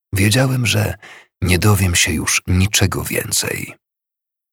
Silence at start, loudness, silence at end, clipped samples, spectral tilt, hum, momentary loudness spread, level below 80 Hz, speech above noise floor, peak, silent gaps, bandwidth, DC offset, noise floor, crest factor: 0.15 s; -16 LUFS; 0.8 s; under 0.1%; -4 dB/octave; none; 10 LU; -36 dBFS; 68 dB; 0 dBFS; none; 18 kHz; under 0.1%; -84 dBFS; 18 dB